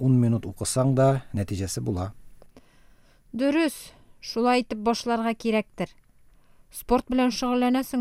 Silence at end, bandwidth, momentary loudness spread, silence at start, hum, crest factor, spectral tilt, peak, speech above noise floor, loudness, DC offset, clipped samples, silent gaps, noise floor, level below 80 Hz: 0 s; 16 kHz; 14 LU; 0 s; none; 16 dB; -6 dB/octave; -10 dBFS; 30 dB; -25 LUFS; under 0.1%; under 0.1%; none; -55 dBFS; -50 dBFS